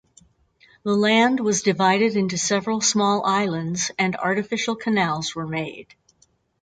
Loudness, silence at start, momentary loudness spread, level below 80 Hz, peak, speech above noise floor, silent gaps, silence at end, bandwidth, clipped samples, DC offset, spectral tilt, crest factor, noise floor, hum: -21 LUFS; 0.85 s; 9 LU; -62 dBFS; -6 dBFS; 42 dB; none; 0.8 s; 9.4 kHz; under 0.1%; under 0.1%; -3.5 dB/octave; 18 dB; -63 dBFS; none